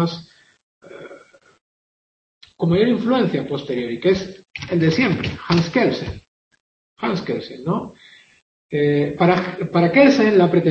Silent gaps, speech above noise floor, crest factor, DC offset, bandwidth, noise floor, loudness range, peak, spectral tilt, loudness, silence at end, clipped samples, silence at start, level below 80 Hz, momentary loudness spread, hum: 0.63-0.81 s, 1.61-2.41 s, 6.28-6.51 s, 6.60-6.96 s, 8.42-8.69 s; 28 dB; 18 dB; under 0.1%; 7.2 kHz; -46 dBFS; 6 LU; -2 dBFS; -7 dB/octave; -19 LUFS; 0 s; under 0.1%; 0 s; -52 dBFS; 19 LU; none